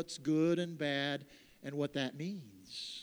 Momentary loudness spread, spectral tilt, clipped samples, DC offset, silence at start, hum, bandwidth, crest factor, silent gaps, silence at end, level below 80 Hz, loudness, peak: 14 LU; -5.5 dB/octave; under 0.1%; under 0.1%; 0 s; none; over 20 kHz; 16 dB; none; 0 s; -76 dBFS; -36 LUFS; -20 dBFS